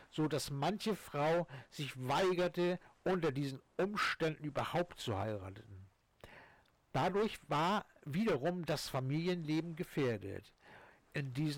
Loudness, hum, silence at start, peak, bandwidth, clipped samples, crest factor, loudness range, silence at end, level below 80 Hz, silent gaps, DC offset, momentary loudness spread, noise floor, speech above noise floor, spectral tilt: -37 LUFS; none; 0 s; -28 dBFS; 18 kHz; under 0.1%; 10 dB; 3 LU; 0 s; -66 dBFS; none; under 0.1%; 10 LU; -67 dBFS; 30 dB; -6 dB/octave